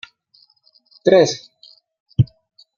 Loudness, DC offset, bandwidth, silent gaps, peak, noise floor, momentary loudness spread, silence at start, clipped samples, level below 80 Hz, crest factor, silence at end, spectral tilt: -17 LUFS; under 0.1%; 7.4 kHz; 2.00-2.06 s; -2 dBFS; -57 dBFS; 12 LU; 1.05 s; under 0.1%; -48 dBFS; 20 dB; 0.5 s; -6 dB/octave